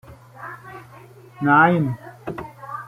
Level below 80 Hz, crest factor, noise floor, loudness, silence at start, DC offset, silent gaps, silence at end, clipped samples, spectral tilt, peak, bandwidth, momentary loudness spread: -58 dBFS; 20 dB; -45 dBFS; -18 LUFS; 0.1 s; under 0.1%; none; 0 s; under 0.1%; -8.5 dB/octave; -2 dBFS; 15 kHz; 24 LU